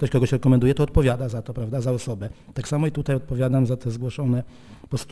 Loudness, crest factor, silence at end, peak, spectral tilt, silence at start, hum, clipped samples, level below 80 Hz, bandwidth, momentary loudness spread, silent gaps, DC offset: -23 LUFS; 16 dB; 0 s; -6 dBFS; -7.5 dB/octave; 0 s; none; under 0.1%; -36 dBFS; 11 kHz; 13 LU; none; under 0.1%